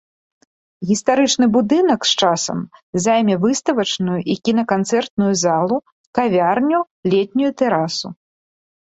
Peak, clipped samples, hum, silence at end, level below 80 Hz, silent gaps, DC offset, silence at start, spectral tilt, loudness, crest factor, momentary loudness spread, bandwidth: -2 dBFS; under 0.1%; none; 0.85 s; -58 dBFS; 2.82-2.93 s, 5.10-5.17 s, 5.92-6.13 s, 6.91-7.03 s; under 0.1%; 0.8 s; -4.5 dB/octave; -17 LUFS; 16 dB; 8 LU; 8.2 kHz